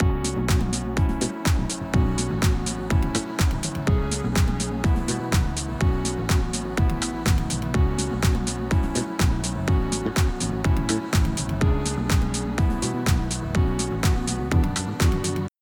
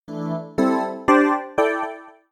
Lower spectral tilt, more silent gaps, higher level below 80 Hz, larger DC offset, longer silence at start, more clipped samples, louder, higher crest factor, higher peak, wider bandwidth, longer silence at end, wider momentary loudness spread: second, -5 dB/octave vs -6.5 dB/octave; neither; first, -28 dBFS vs -56 dBFS; neither; about the same, 0 s vs 0.1 s; neither; second, -24 LUFS vs -21 LUFS; second, 14 dB vs 20 dB; second, -8 dBFS vs -2 dBFS; first, over 20 kHz vs 12.5 kHz; about the same, 0.1 s vs 0.2 s; second, 3 LU vs 12 LU